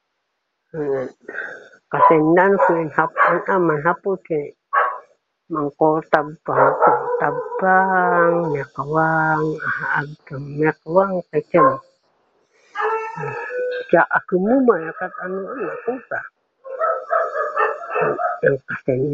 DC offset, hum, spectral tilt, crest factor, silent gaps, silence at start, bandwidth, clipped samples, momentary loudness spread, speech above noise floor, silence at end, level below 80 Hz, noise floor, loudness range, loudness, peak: under 0.1%; none; -8.5 dB/octave; 20 dB; none; 0.75 s; 7.2 kHz; under 0.1%; 13 LU; 55 dB; 0 s; -60 dBFS; -74 dBFS; 5 LU; -19 LUFS; 0 dBFS